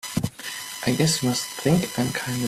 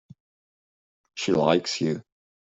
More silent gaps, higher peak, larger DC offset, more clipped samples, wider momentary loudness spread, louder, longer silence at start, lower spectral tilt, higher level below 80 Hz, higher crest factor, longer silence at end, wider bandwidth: neither; second, -8 dBFS vs -4 dBFS; neither; neither; second, 10 LU vs 13 LU; about the same, -24 LUFS vs -25 LUFS; second, 0.05 s vs 1.15 s; about the same, -4.5 dB/octave vs -5 dB/octave; first, -52 dBFS vs -66 dBFS; about the same, 18 dB vs 22 dB; second, 0 s vs 0.4 s; first, 16 kHz vs 8.2 kHz